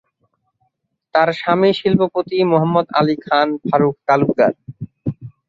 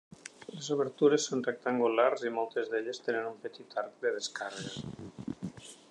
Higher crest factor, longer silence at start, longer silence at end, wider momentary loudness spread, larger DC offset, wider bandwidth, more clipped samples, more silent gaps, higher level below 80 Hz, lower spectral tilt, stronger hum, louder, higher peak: about the same, 16 dB vs 20 dB; first, 1.15 s vs 0.25 s; about the same, 0.2 s vs 0.15 s; second, 12 LU vs 17 LU; neither; second, 7.4 kHz vs 10.5 kHz; neither; neither; first, -54 dBFS vs -72 dBFS; first, -8 dB/octave vs -4 dB/octave; neither; first, -17 LUFS vs -33 LUFS; first, -2 dBFS vs -12 dBFS